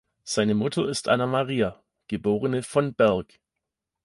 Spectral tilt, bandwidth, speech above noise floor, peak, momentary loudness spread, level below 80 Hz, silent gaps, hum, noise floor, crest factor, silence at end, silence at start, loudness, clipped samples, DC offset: -5.5 dB/octave; 11.5 kHz; 61 dB; -8 dBFS; 7 LU; -56 dBFS; none; none; -85 dBFS; 18 dB; 0.8 s; 0.25 s; -25 LUFS; under 0.1%; under 0.1%